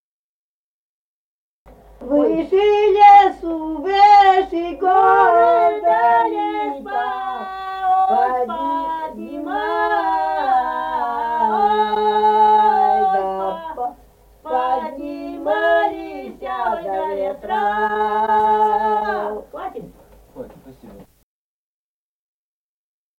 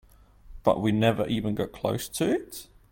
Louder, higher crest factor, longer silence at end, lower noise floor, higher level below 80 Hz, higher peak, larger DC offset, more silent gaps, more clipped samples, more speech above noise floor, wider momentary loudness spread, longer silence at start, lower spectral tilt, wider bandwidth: first, -17 LUFS vs -27 LUFS; about the same, 16 dB vs 20 dB; first, 2.15 s vs 0.25 s; first, under -90 dBFS vs -51 dBFS; about the same, -52 dBFS vs -50 dBFS; first, -2 dBFS vs -8 dBFS; neither; neither; neither; first, over 77 dB vs 25 dB; first, 16 LU vs 7 LU; first, 2 s vs 0.45 s; about the same, -5 dB/octave vs -6 dB/octave; second, 7.4 kHz vs 17 kHz